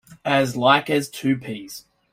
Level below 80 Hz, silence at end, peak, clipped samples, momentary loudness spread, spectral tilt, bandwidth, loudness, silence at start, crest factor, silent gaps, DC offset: -62 dBFS; 0.3 s; -4 dBFS; under 0.1%; 18 LU; -5 dB/octave; 16 kHz; -20 LUFS; 0.1 s; 18 dB; none; under 0.1%